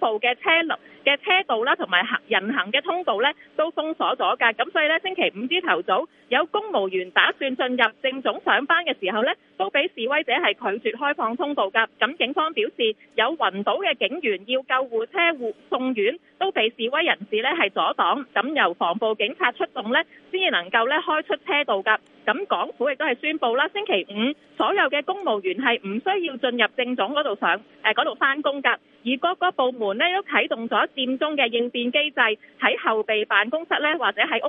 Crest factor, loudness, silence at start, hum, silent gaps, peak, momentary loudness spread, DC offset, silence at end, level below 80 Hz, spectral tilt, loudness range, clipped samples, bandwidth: 22 dB; -22 LUFS; 0 s; none; none; -2 dBFS; 5 LU; under 0.1%; 0 s; -78 dBFS; -6.5 dB/octave; 1 LU; under 0.1%; 4.7 kHz